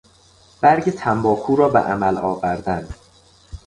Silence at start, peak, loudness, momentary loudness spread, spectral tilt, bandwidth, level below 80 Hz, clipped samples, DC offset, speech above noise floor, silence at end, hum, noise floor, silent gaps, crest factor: 0.6 s; -2 dBFS; -19 LUFS; 9 LU; -7.5 dB/octave; 11 kHz; -44 dBFS; under 0.1%; under 0.1%; 34 dB; 0.1 s; none; -52 dBFS; none; 18 dB